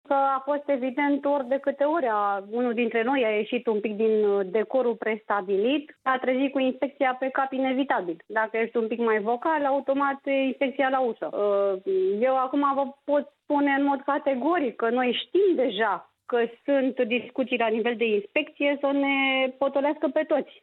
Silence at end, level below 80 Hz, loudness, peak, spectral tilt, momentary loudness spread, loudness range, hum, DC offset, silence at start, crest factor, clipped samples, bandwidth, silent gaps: 0.2 s; -82 dBFS; -25 LUFS; -10 dBFS; -8 dB/octave; 4 LU; 1 LU; none; under 0.1%; 0.1 s; 16 dB; under 0.1%; 4.2 kHz; none